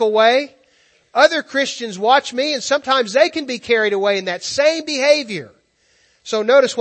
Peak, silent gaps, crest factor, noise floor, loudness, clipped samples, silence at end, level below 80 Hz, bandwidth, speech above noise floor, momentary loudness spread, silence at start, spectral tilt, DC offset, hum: 0 dBFS; none; 18 dB; -59 dBFS; -16 LUFS; under 0.1%; 0 s; -66 dBFS; 8.8 kHz; 42 dB; 9 LU; 0 s; -2.5 dB/octave; under 0.1%; none